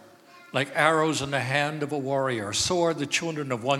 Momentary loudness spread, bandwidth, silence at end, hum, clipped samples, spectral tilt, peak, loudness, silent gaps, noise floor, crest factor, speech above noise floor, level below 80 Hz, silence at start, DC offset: 8 LU; 16 kHz; 0 s; none; under 0.1%; -3.5 dB/octave; -6 dBFS; -25 LUFS; none; -51 dBFS; 20 dB; 26 dB; -60 dBFS; 0 s; under 0.1%